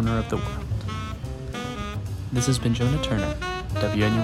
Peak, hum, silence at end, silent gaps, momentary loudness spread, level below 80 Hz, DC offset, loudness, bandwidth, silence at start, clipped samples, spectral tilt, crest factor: -10 dBFS; none; 0 s; none; 9 LU; -36 dBFS; under 0.1%; -27 LUFS; 15 kHz; 0 s; under 0.1%; -5.5 dB/octave; 16 dB